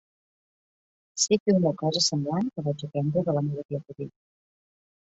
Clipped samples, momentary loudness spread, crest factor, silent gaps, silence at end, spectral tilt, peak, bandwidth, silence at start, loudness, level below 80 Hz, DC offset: under 0.1%; 16 LU; 20 dB; 1.40-1.46 s, 3.65-3.69 s; 0.95 s; -5 dB/octave; -10 dBFS; 8.4 kHz; 1.15 s; -26 LUFS; -68 dBFS; under 0.1%